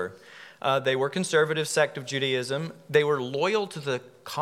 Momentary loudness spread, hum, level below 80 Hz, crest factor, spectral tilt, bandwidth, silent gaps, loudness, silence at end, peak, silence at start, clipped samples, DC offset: 10 LU; none; -80 dBFS; 20 dB; -4 dB/octave; 15.5 kHz; none; -26 LUFS; 0 s; -8 dBFS; 0 s; under 0.1%; under 0.1%